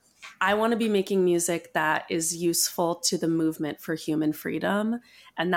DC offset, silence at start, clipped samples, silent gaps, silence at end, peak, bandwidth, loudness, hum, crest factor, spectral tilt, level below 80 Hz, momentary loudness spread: under 0.1%; 0.2 s; under 0.1%; none; 0 s; -10 dBFS; 17 kHz; -26 LUFS; none; 16 dB; -3.5 dB/octave; -66 dBFS; 7 LU